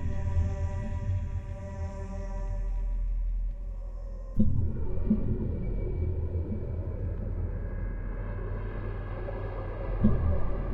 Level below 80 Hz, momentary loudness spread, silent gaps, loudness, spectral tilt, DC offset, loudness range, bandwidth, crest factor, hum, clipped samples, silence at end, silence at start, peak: -32 dBFS; 9 LU; none; -34 LUFS; -10 dB/octave; under 0.1%; 4 LU; 6.4 kHz; 20 dB; none; under 0.1%; 0 s; 0 s; -8 dBFS